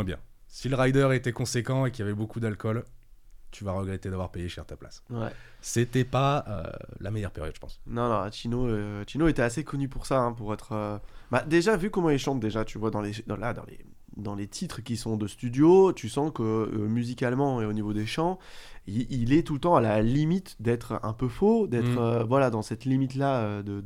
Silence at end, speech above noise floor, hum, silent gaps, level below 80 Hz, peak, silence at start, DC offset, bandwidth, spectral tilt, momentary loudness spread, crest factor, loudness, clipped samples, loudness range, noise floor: 0 s; 22 dB; none; none; -44 dBFS; -8 dBFS; 0 s; under 0.1%; 15.5 kHz; -6.5 dB/octave; 14 LU; 20 dB; -28 LUFS; under 0.1%; 7 LU; -49 dBFS